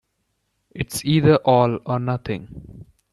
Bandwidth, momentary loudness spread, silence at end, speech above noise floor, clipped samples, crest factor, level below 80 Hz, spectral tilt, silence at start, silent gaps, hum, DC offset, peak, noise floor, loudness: 13 kHz; 15 LU; 0.3 s; 53 dB; under 0.1%; 18 dB; -48 dBFS; -6.5 dB/octave; 0.75 s; none; none; under 0.1%; -2 dBFS; -72 dBFS; -20 LUFS